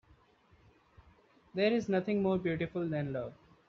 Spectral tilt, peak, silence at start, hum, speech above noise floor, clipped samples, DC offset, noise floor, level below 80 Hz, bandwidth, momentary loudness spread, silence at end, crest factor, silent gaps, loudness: -6 dB/octave; -16 dBFS; 1.55 s; none; 33 dB; under 0.1%; under 0.1%; -66 dBFS; -66 dBFS; 7.2 kHz; 10 LU; 0.35 s; 18 dB; none; -33 LUFS